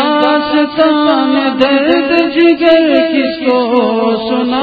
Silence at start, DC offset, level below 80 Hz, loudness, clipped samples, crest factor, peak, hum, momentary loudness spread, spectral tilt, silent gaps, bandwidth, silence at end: 0 s; under 0.1%; -48 dBFS; -11 LUFS; 0.1%; 10 dB; 0 dBFS; none; 5 LU; -6.5 dB/octave; none; 5 kHz; 0 s